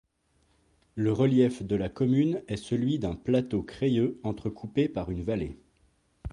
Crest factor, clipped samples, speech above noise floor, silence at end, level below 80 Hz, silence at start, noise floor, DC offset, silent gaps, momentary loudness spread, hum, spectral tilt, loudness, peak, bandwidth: 18 dB; under 0.1%; 42 dB; 0 s; -50 dBFS; 0.95 s; -69 dBFS; under 0.1%; none; 9 LU; none; -8 dB/octave; -28 LUFS; -10 dBFS; 11 kHz